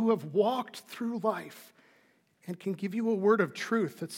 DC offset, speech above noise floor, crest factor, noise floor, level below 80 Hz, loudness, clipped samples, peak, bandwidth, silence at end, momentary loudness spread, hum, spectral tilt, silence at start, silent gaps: under 0.1%; 37 dB; 18 dB; -67 dBFS; under -90 dBFS; -30 LUFS; under 0.1%; -12 dBFS; 17 kHz; 0 s; 17 LU; none; -6 dB/octave; 0 s; none